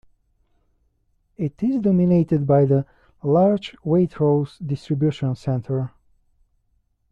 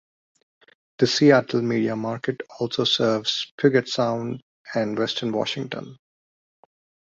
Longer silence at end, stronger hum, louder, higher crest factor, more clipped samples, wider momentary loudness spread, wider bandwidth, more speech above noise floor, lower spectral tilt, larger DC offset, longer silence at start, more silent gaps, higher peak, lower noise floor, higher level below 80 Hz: first, 1.25 s vs 1.1 s; neither; about the same, -21 LUFS vs -23 LUFS; second, 16 dB vs 22 dB; neither; about the same, 12 LU vs 13 LU; about the same, 7.4 kHz vs 7.8 kHz; second, 47 dB vs over 68 dB; first, -10 dB/octave vs -5 dB/octave; neither; first, 1.4 s vs 1 s; second, none vs 3.51-3.58 s, 4.42-4.65 s; second, -6 dBFS vs -2 dBFS; second, -67 dBFS vs under -90 dBFS; first, -54 dBFS vs -64 dBFS